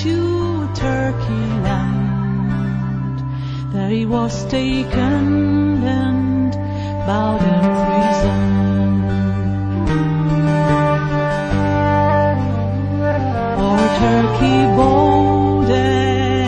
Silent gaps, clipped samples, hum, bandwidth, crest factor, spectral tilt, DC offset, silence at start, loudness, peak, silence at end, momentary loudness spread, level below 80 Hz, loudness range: none; under 0.1%; none; 9.2 kHz; 14 dB; -7.5 dB/octave; under 0.1%; 0 s; -17 LUFS; -2 dBFS; 0 s; 6 LU; -32 dBFS; 5 LU